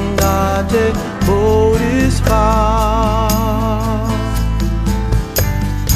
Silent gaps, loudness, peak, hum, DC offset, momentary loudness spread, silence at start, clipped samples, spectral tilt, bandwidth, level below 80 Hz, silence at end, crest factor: none; -15 LUFS; 0 dBFS; none; under 0.1%; 5 LU; 0 s; under 0.1%; -6 dB/octave; 15.5 kHz; -20 dBFS; 0 s; 14 dB